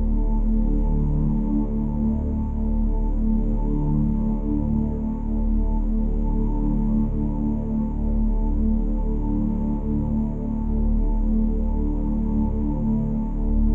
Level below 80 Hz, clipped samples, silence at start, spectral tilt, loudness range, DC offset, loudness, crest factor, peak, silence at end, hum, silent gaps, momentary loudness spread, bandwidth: -24 dBFS; under 0.1%; 0 s; -12.5 dB/octave; 1 LU; under 0.1%; -25 LUFS; 10 dB; -10 dBFS; 0 s; none; none; 3 LU; 1.6 kHz